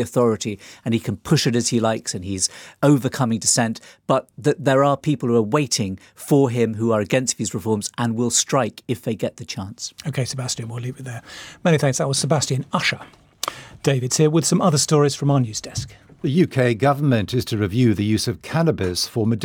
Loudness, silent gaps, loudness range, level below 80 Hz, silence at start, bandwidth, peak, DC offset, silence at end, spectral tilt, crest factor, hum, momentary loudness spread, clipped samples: -20 LUFS; none; 4 LU; -56 dBFS; 0 s; 18.5 kHz; -2 dBFS; under 0.1%; 0 s; -5 dB/octave; 18 dB; none; 12 LU; under 0.1%